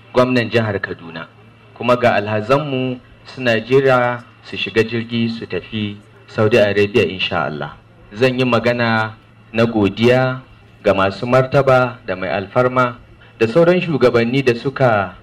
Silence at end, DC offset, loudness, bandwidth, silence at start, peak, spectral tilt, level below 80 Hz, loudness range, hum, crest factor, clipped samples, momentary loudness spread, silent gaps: 0.05 s; under 0.1%; -16 LUFS; 13.5 kHz; 0.15 s; -4 dBFS; -7 dB/octave; -50 dBFS; 3 LU; none; 14 dB; under 0.1%; 13 LU; none